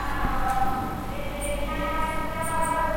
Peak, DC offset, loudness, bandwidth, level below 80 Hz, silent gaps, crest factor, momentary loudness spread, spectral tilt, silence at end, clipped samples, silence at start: -12 dBFS; under 0.1%; -28 LUFS; 16.5 kHz; -34 dBFS; none; 14 dB; 6 LU; -4.5 dB/octave; 0 s; under 0.1%; 0 s